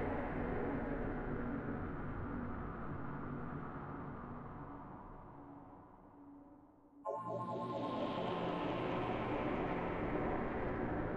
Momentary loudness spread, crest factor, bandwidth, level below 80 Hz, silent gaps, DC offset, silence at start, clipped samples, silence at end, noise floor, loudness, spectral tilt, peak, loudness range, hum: 16 LU; 14 dB; 8.6 kHz; -52 dBFS; none; under 0.1%; 0 s; under 0.1%; 0 s; -62 dBFS; -42 LUFS; -8.5 dB/octave; -26 dBFS; 11 LU; none